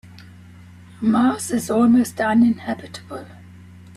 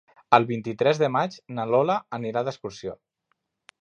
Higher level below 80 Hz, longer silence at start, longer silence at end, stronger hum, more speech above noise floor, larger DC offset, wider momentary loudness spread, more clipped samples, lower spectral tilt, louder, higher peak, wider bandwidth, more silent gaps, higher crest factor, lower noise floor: first, -58 dBFS vs -68 dBFS; first, 1 s vs 0.3 s; second, 0.65 s vs 0.85 s; neither; second, 25 dB vs 51 dB; neither; first, 18 LU vs 14 LU; neither; about the same, -5.5 dB/octave vs -6 dB/octave; first, -19 LUFS vs -24 LUFS; second, -8 dBFS vs -2 dBFS; first, 13.5 kHz vs 8.6 kHz; neither; second, 14 dB vs 24 dB; second, -43 dBFS vs -75 dBFS